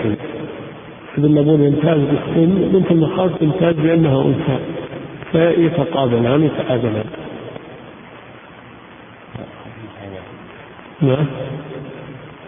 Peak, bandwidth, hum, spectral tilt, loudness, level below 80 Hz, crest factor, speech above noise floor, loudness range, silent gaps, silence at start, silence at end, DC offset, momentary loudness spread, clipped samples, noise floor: -2 dBFS; 3.7 kHz; none; -13 dB/octave; -16 LUFS; -48 dBFS; 16 dB; 25 dB; 19 LU; none; 0 s; 0 s; under 0.1%; 22 LU; under 0.1%; -39 dBFS